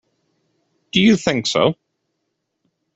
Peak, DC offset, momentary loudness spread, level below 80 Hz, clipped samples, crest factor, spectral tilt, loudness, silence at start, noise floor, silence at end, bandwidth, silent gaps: -2 dBFS; under 0.1%; 7 LU; -56 dBFS; under 0.1%; 18 dB; -4.5 dB/octave; -17 LUFS; 0.95 s; -74 dBFS; 1.25 s; 8.2 kHz; none